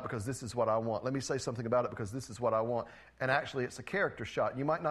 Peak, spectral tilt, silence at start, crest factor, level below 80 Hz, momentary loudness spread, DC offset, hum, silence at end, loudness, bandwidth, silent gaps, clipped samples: -14 dBFS; -5.5 dB/octave; 0 s; 20 dB; -64 dBFS; 6 LU; under 0.1%; none; 0 s; -34 LUFS; 13 kHz; none; under 0.1%